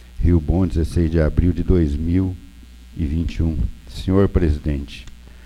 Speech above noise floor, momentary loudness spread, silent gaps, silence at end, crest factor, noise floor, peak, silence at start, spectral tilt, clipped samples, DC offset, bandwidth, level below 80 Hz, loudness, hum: 23 dB; 11 LU; none; 0 s; 16 dB; -41 dBFS; -2 dBFS; 0 s; -8.5 dB/octave; under 0.1%; under 0.1%; 11 kHz; -24 dBFS; -20 LUFS; none